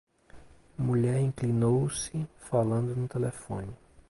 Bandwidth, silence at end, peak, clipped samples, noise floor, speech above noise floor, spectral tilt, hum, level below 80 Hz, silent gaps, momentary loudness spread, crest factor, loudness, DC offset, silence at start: 11.5 kHz; 0.35 s; -14 dBFS; under 0.1%; -52 dBFS; 24 dB; -7 dB/octave; none; -56 dBFS; none; 12 LU; 16 dB; -30 LUFS; under 0.1%; 0.35 s